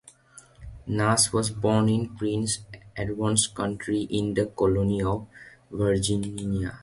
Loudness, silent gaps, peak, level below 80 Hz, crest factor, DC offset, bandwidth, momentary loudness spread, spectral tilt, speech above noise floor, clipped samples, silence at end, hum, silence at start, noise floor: -26 LUFS; none; -6 dBFS; -46 dBFS; 20 dB; under 0.1%; 12 kHz; 11 LU; -4.5 dB/octave; 28 dB; under 0.1%; 0.05 s; none; 0.35 s; -53 dBFS